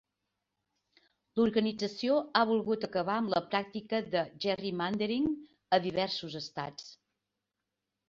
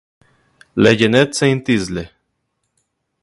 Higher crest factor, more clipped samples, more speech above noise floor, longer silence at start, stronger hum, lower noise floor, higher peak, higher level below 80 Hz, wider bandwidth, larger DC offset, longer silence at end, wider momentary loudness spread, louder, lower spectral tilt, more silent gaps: first, 24 dB vs 18 dB; neither; about the same, 56 dB vs 57 dB; first, 1.35 s vs 0.75 s; neither; first, -87 dBFS vs -71 dBFS; second, -10 dBFS vs 0 dBFS; second, -70 dBFS vs -48 dBFS; second, 7.4 kHz vs 11.5 kHz; neither; about the same, 1.15 s vs 1.15 s; second, 11 LU vs 14 LU; second, -32 LUFS vs -15 LUFS; about the same, -5.5 dB/octave vs -5 dB/octave; neither